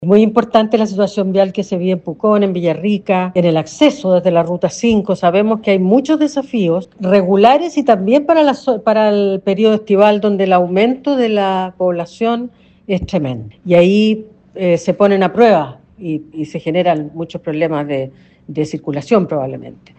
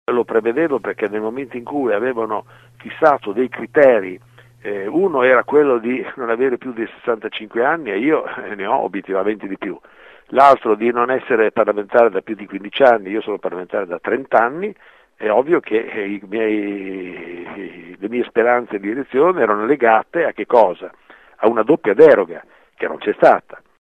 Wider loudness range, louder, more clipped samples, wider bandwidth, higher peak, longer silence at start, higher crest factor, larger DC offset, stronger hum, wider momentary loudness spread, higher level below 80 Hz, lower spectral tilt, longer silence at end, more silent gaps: about the same, 4 LU vs 5 LU; first, -14 LUFS vs -17 LUFS; neither; about the same, 8.6 kHz vs 8.2 kHz; about the same, 0 dBFS vs 0 dBFS; about the same, 0 s vs 0.1 s; about the same, 14 dB vs 18 dB; neither; neither; second, 11 LU vs 15 LU; first, -50 dBFS vs -62 dBFS; about the same, -6.5 dB/octave vs -7 dB/octave; about the same, 0.3 s vs 0.25 s; neither